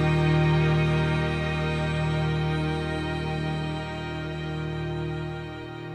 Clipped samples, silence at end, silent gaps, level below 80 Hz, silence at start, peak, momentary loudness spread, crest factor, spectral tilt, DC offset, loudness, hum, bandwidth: under 0.1%; 0 s; none; -40 dBFS; 0 s; -12 dBFS; 10 LU; 14 dB; -7.5 dB/octave; under 0.1%; -27 LUFS; none; 9.2 kHz